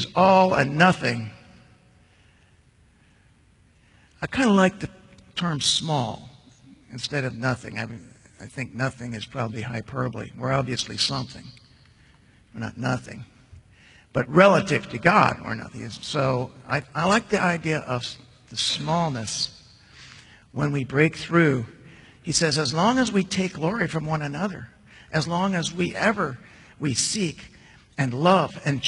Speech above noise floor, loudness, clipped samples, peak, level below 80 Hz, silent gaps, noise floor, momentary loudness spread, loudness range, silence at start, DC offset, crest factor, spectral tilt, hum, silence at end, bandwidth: 35 dB; -23 LUFS; under 0.1%; -2 dBFS; -56 dBFS; none; -58 dBFS; 17 LU; 8 LU; 0 s; under 0.1%; 22 dB; -4.5 dB/octave; none; 0 s; 11 kHz